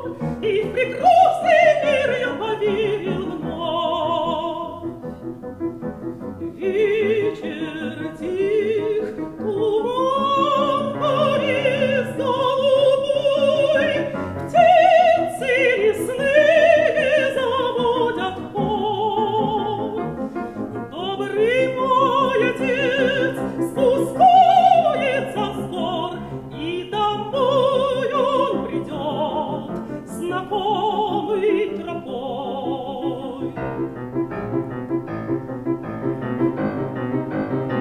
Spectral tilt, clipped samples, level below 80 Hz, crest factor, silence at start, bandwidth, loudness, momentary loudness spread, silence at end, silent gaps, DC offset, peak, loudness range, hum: -6 dB/octave; under 0.1%; -50 dBFS; 16 dB; 0 s; 14 kHz; -20 LUFS; 13 LU; 0 s; none; under 0.1%; -4 dBFS; 9 LU; none